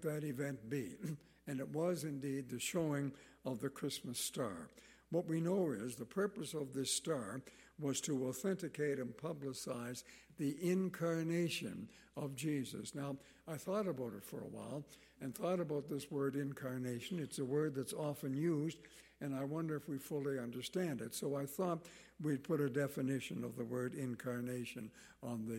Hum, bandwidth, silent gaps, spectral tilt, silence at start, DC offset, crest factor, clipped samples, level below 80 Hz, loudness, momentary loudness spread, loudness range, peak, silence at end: none; 16.5 kHz; none; -5.5 dB/octave; 0 s; under 0.1%; 16 dB; under 0.1%; -76 dBFS; -42 LUFS; 11 LU; 2 LU; -26 dBFS; 0 s